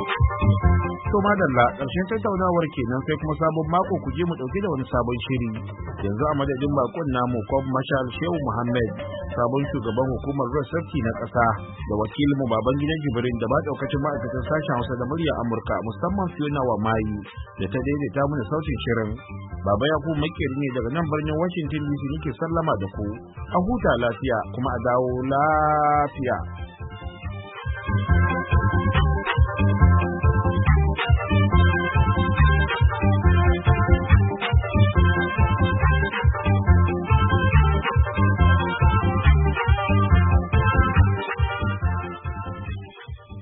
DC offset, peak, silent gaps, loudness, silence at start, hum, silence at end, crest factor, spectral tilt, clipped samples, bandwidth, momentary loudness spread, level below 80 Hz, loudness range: under 0.1%; -4 dBFS; none; -22 LUFS; 0 s; none; 0 s; 18 dB; -12 dB/octave; under 0.1%; 4 kHz; 10 LU; -28 dBFS; 6 LU